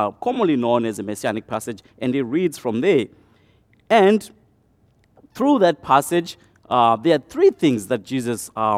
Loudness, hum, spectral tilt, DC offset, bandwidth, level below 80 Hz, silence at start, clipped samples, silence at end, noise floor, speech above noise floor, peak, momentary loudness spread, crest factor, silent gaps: -20 LUFS; none; -5.5 dB/octave; under 0.1%; 15.5 kHz; -62 dBFS; 0 s; under 0.1%; 0 s; -59 dBFS; 40 dB; -2 dBFS; 10 LU; 18 dB; none